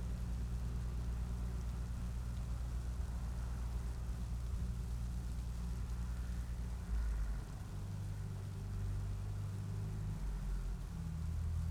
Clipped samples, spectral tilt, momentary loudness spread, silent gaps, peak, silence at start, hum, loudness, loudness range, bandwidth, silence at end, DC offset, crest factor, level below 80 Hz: under 0.1%; -6.5 dB/octave; 3 LU; none; -30 dBFS; 0 s; none; -43 LUFS; 1 LU; 14 kHz; 0 s; under 0.1%; 10 dB; -42 dBFS